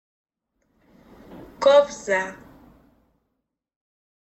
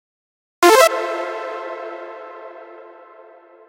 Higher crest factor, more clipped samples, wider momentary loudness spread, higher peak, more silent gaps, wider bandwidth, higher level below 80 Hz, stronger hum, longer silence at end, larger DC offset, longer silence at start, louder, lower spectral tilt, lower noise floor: about the same, 20 dB vs 20 dB; neither; second, 9 LU vs 25 LU; second, -6 dBFS vs 0 dBFS; neither; second, 8.4 kHz vs 16 kHz; first, -62 dBFS vs -76 dBFS; neither; first, 1.95 s vs 0.8 s; neither; first, 1.35 s vs 0.6 s; second, -20 LUFS vs -16 LUFS; first, -3 dB/octave vs -0.5 dB/octave; first, -79 dBFS vs -45 dBFS